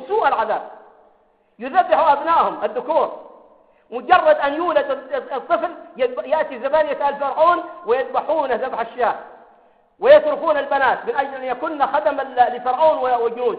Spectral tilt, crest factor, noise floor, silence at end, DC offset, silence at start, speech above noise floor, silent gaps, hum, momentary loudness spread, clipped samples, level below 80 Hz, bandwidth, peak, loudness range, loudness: -8 dB/octave; 18 dB; -58 dBFS; 0 s; under 0.1%; 0 s; 40 dB; none; none; 10 LU; under 0.1%; -60 dBFS; 4.9 kHz; -2 dBFS; 2 LU; -19 LUFS